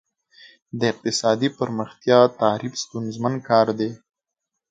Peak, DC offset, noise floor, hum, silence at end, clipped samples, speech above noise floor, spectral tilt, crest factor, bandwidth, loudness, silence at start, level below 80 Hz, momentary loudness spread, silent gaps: -2 dBFS; under 0.1%; -82 dBFS; none; 0.75 s; under 0.1%; 62 dB; -5 dB/octave; 22 dB; 9.4 kHz; -21 LUFS; 0.75 s; -66 dBFS; 12 LU; none